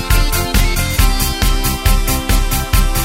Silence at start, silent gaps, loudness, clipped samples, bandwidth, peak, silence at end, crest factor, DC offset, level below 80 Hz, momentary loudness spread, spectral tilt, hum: 0 s; none; -15 LUFS; under 0.1%; 16.5 kHz; 0 dBFS; 0 s; 14 dB; under 0.1%; -14 dBFS; 1 LU; -3.5 dB/octave; none